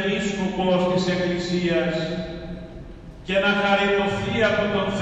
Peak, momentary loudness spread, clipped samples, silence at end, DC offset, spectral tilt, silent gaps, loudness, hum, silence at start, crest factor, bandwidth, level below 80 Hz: -6 dBFS; 17 LU; under 0.1%; 0 s; under 0.1%; -5.5 dB/octave; none; -22 LUFS; none; 0 s; 18 dB; 8.8 kHz; -44 dBFS